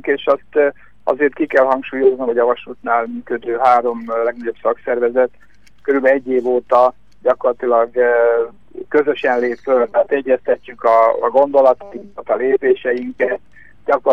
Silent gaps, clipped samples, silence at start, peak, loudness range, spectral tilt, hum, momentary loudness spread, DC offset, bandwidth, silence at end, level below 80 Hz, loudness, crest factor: none; under 0.1%; 0.05 s; -2 dBFS; 2 LU; -6.5 dB/octave; none; 8 LU; 0.8%; 6.6 kHz; 0 s; -58 dBFS; -16 LUFS; 14 dB